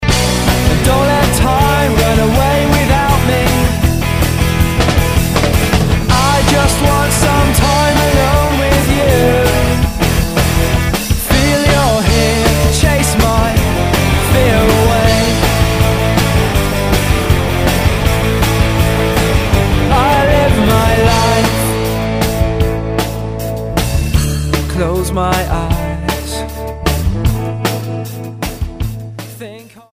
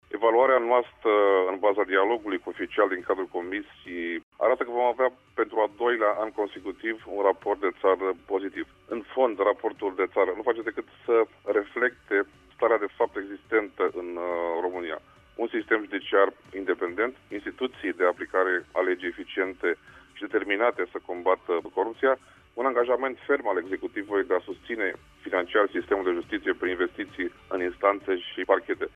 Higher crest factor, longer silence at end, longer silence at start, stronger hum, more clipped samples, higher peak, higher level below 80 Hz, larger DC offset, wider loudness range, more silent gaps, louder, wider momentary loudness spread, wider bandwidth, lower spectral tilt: second, 12 dB vs 20 dB; about the same, 0.1 s vs 0.05 s; about the same, 0 s vs 0.1 s; neither; neither; first, 0 dBFS vs -8 dBFS; first, -18 dBFS vs -64 dBFS; first, 0.8% vs under 0.1%; first, 5 LU vs 2 LU; second, none vs 4.23-4.32 s; first, -12 LUFS vs -27 LUFS; about the same, 8 LU vs 9 LU; first, 16 kHz vs 4.5 kHz; about the same, -5 dB/octave vs -5.5 dB/octave